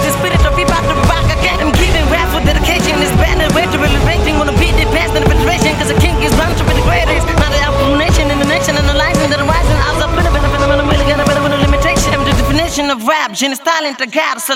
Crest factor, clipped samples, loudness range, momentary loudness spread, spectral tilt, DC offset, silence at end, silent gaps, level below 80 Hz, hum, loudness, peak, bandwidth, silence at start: 12 dB; under 0.1%; 0 LU; 2 LU; -4.5 dB/octave; under 0.1%; 0 s; none; -18 dBFS; none; -12 LUFS; 0 dBFS; 16.5 kHz; 0 s